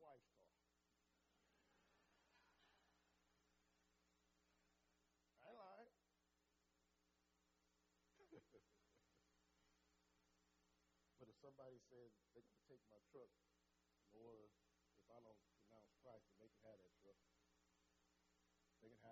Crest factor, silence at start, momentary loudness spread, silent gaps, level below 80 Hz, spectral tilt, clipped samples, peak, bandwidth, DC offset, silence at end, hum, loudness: 20 dB; 0 s; 5 LU; none; under -90 dBFS; -4.5 dB/octave; under 0.1%; -52 dBFS; 7.4 kHz; under 0.1%; 0 s; none; -67 LUFS